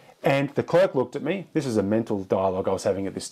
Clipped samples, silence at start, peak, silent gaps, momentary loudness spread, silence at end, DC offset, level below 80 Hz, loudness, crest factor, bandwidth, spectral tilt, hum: under 0.1%; 0.25 s; -8 dBFS; none; 6 LU; 0 s; under 0.1%; -64 dBFS; -25 LUFS; 16 dB; 14.5 kHz; -6 dB/octave; none